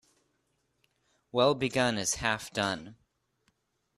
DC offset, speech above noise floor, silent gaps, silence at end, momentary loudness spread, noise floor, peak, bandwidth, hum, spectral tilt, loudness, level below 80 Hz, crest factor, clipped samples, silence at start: under 0.1%; 47 dB; none; 1.05 s; 7 LU; -76 dBFS; -10 dBFS; 13.5 kHz; none; -3.5 dB/octave; -29 LUFS; -60 dBFS; 24 dB; under 0.1%; 1.35 s